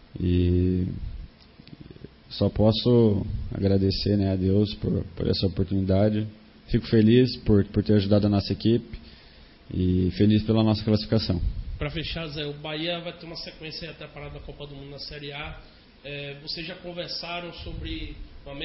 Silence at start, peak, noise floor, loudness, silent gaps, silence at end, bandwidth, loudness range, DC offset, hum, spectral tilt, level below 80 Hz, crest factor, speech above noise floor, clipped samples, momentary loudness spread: 0.15 s; -6 dBFS; -50 dBFS; -25 LUFS; none; 0 s; 5.8 kHz; 12 LU; under 0.1%; none; -10.5 dB/octave; -40 dBFS; 18 dB; 26 dB; under 0.1%; 19 LU